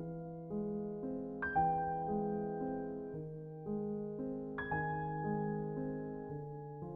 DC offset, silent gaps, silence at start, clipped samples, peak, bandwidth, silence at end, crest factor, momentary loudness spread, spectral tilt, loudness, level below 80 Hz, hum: under 0.1%; none; 0 s; under 0.1%; -22 dBFS; 3.6 kHz; 0 s; 16 dB; 10 LU; -8 dB/octave; -40 LUFS; -62 dBFS; none